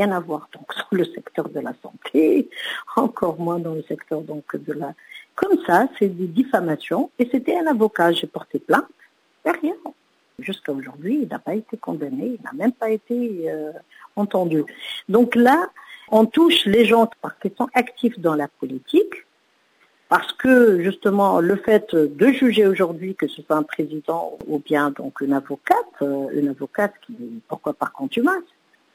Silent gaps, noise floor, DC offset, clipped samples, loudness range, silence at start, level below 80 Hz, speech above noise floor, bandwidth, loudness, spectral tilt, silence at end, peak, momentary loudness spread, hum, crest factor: none; -62 dBFS; under 0.1%; under 0.1%; 8 LU; 0 s; -64 dBFS; 42 dB; 16 kHz; -21 LUFS; -6 dB/octave; 0.5 s; -2 dBFS; 15 LU; none; 18 dB